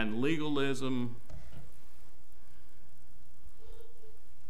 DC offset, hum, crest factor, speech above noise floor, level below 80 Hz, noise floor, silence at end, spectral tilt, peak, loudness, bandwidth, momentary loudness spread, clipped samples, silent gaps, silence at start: 3%; none; 22 dB; 26 dB; -58 dBFS; -60 dBFS; 0 s; -6 dB/octave; -18 dBFS; -34 LUFS; 16 kHz; 25 LU; under 0.1%; none; 0 s